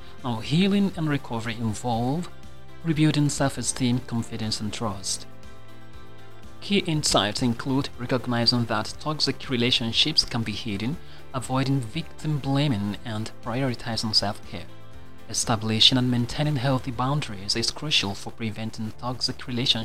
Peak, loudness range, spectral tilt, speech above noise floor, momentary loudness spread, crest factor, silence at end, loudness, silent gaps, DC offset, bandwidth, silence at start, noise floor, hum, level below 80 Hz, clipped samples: -4 dBFS; 5 LU; -4.5 dB/octave; 21 dB; 11 LU; 22 dB; 0 s; -25 LUFS; none; 2%; 15.5 kHz; 0 s; -46 dBFS; none; -48 dBFS; under 0.1%